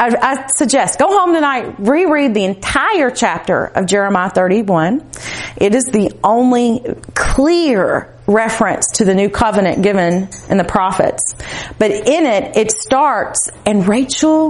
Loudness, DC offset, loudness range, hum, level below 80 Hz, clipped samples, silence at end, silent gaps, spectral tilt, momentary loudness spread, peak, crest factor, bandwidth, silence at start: -14 LUFS; under 0.1%; 1 LU; none; -34 dBFS; under 0.1%; 0 s; none; -4 dB/octave; 5 LU; 0 dBFS; 14 dB; 11.5 kHz; 0 s